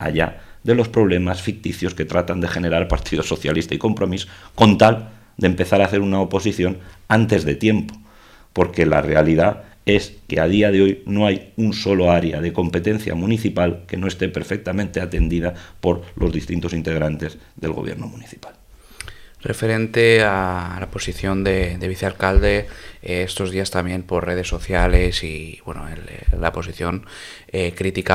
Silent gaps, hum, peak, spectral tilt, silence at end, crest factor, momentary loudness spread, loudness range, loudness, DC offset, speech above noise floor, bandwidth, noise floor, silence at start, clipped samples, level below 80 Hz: none; none; 0 dBFS; -6 dB/octave; 0 s; 20 dB; 14 LU; 6 LU; -20 LUFS; under 0.1%; 28 dB; 15.5 kHz; -47 dBFS; 0 s; under 0.1%; -30 dBFS